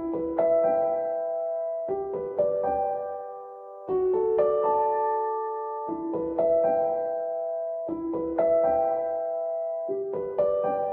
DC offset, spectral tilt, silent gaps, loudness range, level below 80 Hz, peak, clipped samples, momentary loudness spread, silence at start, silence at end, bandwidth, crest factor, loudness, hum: under 0.1%; -10.5 dB/octave; none; 2 LU; -60 dBFS; -12 dBFS; under 0.1%; 9 LU; 0 s; 0 s; 3.2 kHz; 14 dB; -27 LUFS; none